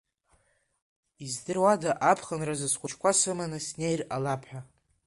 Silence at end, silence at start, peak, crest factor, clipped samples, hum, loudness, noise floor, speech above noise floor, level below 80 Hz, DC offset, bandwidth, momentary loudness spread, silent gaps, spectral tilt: 0.4 s; 1.2 s; -8 dBFS; 22 dB; under 0.1%; none; -28 LUFS; -69 dBFS; 41 dB; -64 dBFS; under 0.1%; 11.5 kHz; 12 LU; none; -3.5 dB/octave